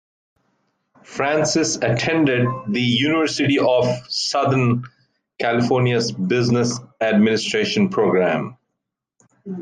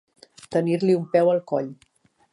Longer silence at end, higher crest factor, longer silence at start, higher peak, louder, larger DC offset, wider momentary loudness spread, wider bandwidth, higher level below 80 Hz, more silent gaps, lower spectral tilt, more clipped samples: second, 0 s vs 0.6 s; about the same, 14 dB vs 18 dB; first, 1.1 s vs 0.5 s; about the same, -6 dBFS vs -6 dBFS; first, -19 LUFS vs -22 LUFS; neither; about the same, 6 LU vs 8 LU; second, 9.8 kHz vs 11 kHz; first, -60 dBFS vs -70 dBFS; neither; second, -5 dB/octave vs -7.5 dB/octave; neither